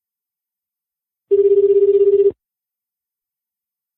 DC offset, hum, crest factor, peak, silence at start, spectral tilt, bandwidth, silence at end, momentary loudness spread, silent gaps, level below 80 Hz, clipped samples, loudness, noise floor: under 0.1%; none; 12 dB; -6 dBFS; 1.3 s; -11 dB/octave; 3 kHz; 1.65 s; 5 LU; none; -64 dBFS; under 0.1%; -14 LUFS; -87 dBFS